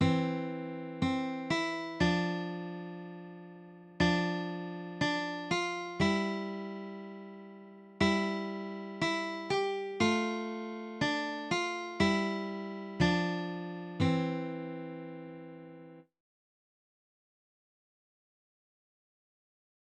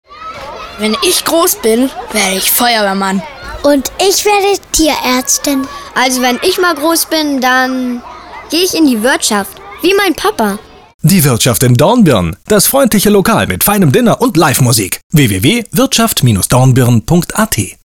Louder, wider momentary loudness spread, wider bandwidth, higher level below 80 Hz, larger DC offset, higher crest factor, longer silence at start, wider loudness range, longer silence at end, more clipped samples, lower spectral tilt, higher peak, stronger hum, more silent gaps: second, -33 LUFS vs -10 LUFS; first, 18 LU vs 8 LU; second, 9.8 kHz vs over 20 kHz; second, -60 dBFS vs -36 dBFS; neither; first, 20 dB vs 10 dB; about the same, 0 s vs 0.1 s; first, 6 LU vs 3 LU; first, 3.95 s vs 0.1 s; neither; first, -5.5 dB/octave vs -4 dB/octave; second, -14 dBFS vs 0 dBFS; neither; second, none vs 10.94-10.99 s, 15.03-15.10 s